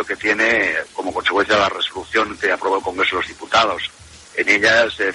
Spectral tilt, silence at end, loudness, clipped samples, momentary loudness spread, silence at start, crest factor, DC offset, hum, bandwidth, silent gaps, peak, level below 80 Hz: -2.5 dB/octave; 0 s; -17 LUFS; under 0.1%; 9 LU; 0 s; 16 dB; under 0.1%; none; 11.5 kHz; none; -2 dBFS; -50 dBFS